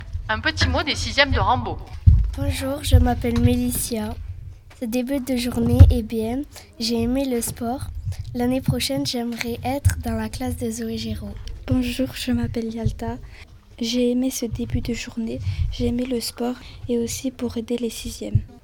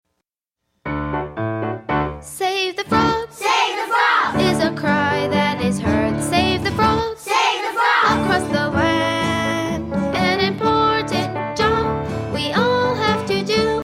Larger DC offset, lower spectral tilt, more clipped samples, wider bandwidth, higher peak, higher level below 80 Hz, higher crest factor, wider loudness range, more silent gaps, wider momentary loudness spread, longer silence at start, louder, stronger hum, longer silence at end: neither; about the same, -5.5 dB/octave vs -5 dB/octave; neither; first, 18 kHz vs 16 kHz; about the same, 0 dBFS vs -2 dBFS; first, -30 dBFS vs -40 dBFS; first, 22 dB vs 16 dB; first, 6 LU vs 2 LU; neither; first, 13 LU vs 8 LU; second, 0 s vs 0.85 s; second, -23 LUFS vs -19 LUFS; neither; about the same, 0.05 s vs 0 s